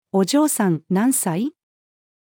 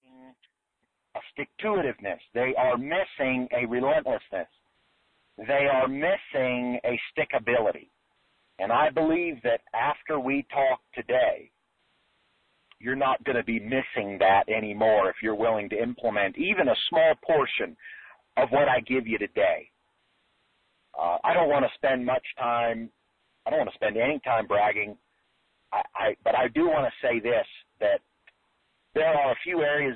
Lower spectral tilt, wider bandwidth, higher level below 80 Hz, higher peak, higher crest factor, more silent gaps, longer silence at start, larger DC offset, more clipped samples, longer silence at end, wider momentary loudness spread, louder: second, -5 dB/octave vs -8.5 dB/octave; first, 19 kHz vs 4.3 kHz; second, -82 dBFS vs -62 dBFS; first, -6 dBFS vs -10 dBFS; about the same, 14 dB vs 16 dB; neither; second, 0.15 s vs 1.15 s; neither; neither; first, 0.85 s vs 0 s; second, 7 LU vs 10 LU; first, -20 LUFS vs -26 LUFS